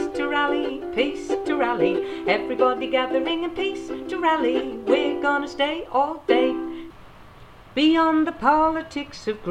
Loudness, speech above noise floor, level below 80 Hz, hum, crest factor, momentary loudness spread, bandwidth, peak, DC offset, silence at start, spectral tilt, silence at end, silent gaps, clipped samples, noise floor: -23 LUFS; 23 dB; -52 dBFS; none; 16 dB; 11 LU; 9.8 kHz; -6 dBFS; under 0.1%; 0 s; -5 dB/octave; 0 s; none; under 0.1%; -45 dBFS